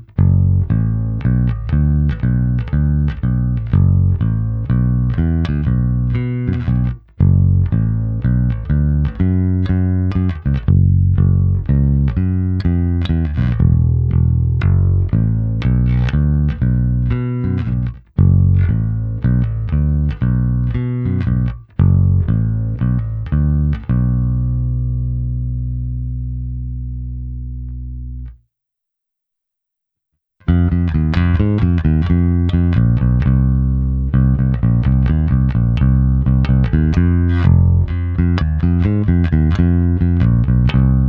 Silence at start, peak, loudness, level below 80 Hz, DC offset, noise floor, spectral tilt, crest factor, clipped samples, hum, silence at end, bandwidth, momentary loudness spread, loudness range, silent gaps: 0 s; 0 dBFS; -16 LUFS; -22 dBFS; under 0.1%; -80 dBFS; -10.5 dB/octave; 14 dB; under 0.1%; none; 0 s; 4.9 kHz; 7 LU; 7 LU; none